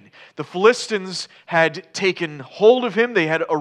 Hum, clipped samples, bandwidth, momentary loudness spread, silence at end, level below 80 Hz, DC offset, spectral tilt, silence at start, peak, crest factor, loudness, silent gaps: none; under 0.1%; 11 kHz; 13 LU; 0 s; -80 dBFS; under 0.1%; -4.5 dB/octave; 0.4 s; 0 dBFS; 18 dB; -19 LUFS; none